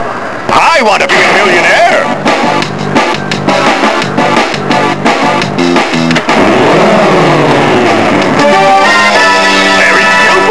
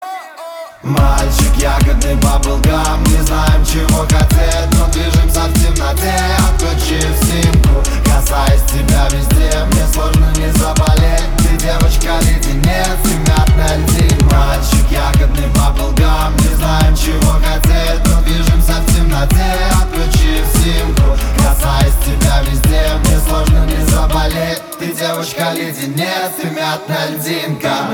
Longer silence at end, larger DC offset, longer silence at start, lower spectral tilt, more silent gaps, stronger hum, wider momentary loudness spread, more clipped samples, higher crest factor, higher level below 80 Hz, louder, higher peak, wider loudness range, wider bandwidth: about the same, 0 s vs 0 s; first, 4% vs under 0.1%; about the same, 0 s vs 0 s; about the same, -4 dB/octave vs -5 dB/octave; neither; neither; about the same, 5 LU vs 6 LU; first, 2% vs under 0.1%; about the same, 8 dB vs 10 dB; second, -40 dBFS vs -12 dBFS; first, -6 LUFS vs -13 LUFS; about the same, 0 dBFS vs 0 dBFS; about the same, 4 LU vs 2 LU; second, 11 kHz vs over 20 kHz